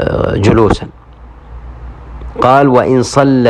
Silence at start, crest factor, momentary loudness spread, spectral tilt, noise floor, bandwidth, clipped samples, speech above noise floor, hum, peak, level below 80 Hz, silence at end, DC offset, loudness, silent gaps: 0 s; 12 dB; 23 LU; -7 dB/octave; -35 dBFS; 11.5 kHz; 0.5%; 26 dB; none; 0 dBFS; -28 dBFS; 0 s; under 0.1%; -10 LUFS; none